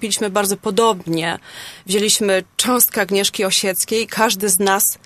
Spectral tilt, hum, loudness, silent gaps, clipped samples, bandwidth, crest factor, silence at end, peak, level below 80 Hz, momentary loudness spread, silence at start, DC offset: -2 dB/octave; none; -16 LUFS; none; under 0.1%; 14 kHz; 18 dB; 0.1 s; 0 dBFS; -58 dBFS; 7 LU; 0 s; under 0.1%